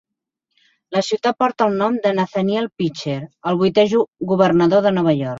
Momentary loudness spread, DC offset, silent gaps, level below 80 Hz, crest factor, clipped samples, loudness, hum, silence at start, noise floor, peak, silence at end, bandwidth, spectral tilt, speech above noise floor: 9 LU; under 0.1%; 4.08-4.12 s; -58 dBFS; 18 dB; under 0.1%; -18 LUFS; none; 0.9 s; -78 dBFS; 0 dBFS; 0 s; 7.8 kHz; -6.5 dB/octave; 60 dB